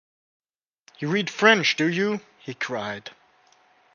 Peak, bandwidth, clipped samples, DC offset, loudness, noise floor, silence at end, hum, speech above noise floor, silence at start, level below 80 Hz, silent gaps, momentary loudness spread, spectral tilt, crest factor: 0 dBFS; 7.2 kHz; under 0.1%; under 0.1%; -23 LUFS; -61 dBFS; 0.85 s; none; 37 dB; 1 s; -72 dBFS; none; 18 LU; -4 dB/octave; 26 dB